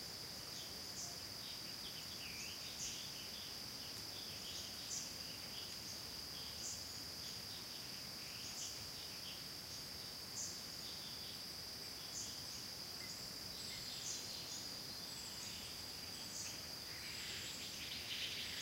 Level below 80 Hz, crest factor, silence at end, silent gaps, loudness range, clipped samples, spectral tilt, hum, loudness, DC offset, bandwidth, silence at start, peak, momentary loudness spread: -70 dBFS; 18 dB; 0 s; none; 1 LU; under 0.1%; -1 dB/octave; none; -46 LUFS; under 0.1%; 16 kHz; 0 s; -32 dBFS; 3 LU